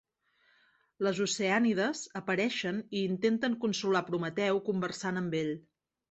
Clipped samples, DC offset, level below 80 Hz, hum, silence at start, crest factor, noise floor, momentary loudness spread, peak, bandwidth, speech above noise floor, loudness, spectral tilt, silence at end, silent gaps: under 0.1%; under 0.1%; -74 dBFS; none; 1 s; 18 dB; -71 dBFS; 6 LU; -14 dBFS; 8.2 kHz; 40 dB; -31 LUFS; -4.5 dB/octave; 0.5 s; none